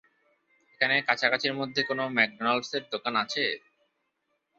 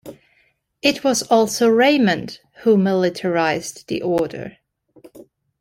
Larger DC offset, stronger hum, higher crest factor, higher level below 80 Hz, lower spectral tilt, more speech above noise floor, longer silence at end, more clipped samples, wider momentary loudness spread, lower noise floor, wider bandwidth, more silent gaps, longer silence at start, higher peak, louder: neither; neither; first, 24 dB vs 18 dB; second, -76 dBFS vs -60 dBFS; about the same, -3.5 dB/octave vs -4.5 dB/octave; first, 49 dB vs 45 dB; first, 1 s vs 0.45 s; neither; second, 6 LU vs 12 LU; first, -78 dBFS vs -62 dBFS; second, 8 kHz vs 16.5 kHz; neither; first, 0.8 s vs 0.05 s; second, -6 dBFS vs -2 dBFS; second, -27 LUFS vs -18 LUFS